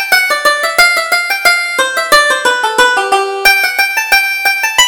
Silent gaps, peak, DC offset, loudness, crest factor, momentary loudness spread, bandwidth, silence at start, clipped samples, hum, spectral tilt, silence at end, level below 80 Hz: none; 0 dBFS; under 0.1%; -9 LUFS; 10 dB; 4 LU; over 20 kHz; 0 s; 0.2%; none; 1 dB/octave; 0 s; -44 dBFS